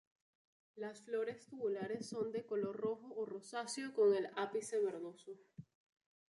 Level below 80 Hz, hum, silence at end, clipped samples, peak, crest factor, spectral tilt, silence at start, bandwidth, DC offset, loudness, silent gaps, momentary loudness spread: -88 dBFS; none; 0.7 s; under 0.1%; -24 dBFS; 18 dB; -4.5 dB/octave; 0.75 s; 11.5 kHz; under 0.1%; -41 LUFS; none; 16 LU